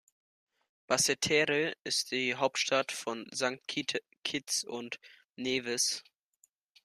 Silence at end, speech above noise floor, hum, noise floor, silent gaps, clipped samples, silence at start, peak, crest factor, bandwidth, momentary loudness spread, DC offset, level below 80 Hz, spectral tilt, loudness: 0.85 s; 39 dB; none; -72 dBFS; 4.18-4.23 s, 5.25-5.29 s; under 0.1%; 0.9 s; -12 dBFS; 22 dB; 14.5 kHz; 12 LU; under 0.1%; -76 dBFS; -1.5 dB/octave; -31 LUFS